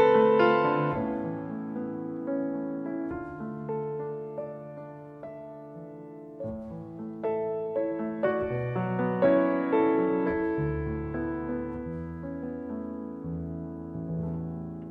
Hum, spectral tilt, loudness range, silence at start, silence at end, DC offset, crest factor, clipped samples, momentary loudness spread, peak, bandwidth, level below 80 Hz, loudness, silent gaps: none; -9.5 dB/octave; 11 LU; 0 s; 0 s; under 0.1%; 20 dB; under 0.1%; 18 LU; -10 dBFS; 5.8 kHz; -52 dBFS; -30 LUFS; none